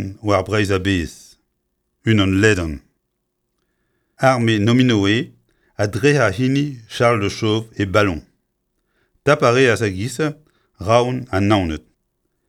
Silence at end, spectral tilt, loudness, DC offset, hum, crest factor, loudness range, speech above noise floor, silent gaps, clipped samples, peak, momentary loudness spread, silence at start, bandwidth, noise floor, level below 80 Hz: 0.7 s; -6 dB/octave; -18 LUFS; under 0.1%; none; 18 dB; 3 LU; 56 dB; none; under 0.1%; 0 dBFS; 11 LU; 0 s; 14 kHz; -73 dBFS; -44 dBFS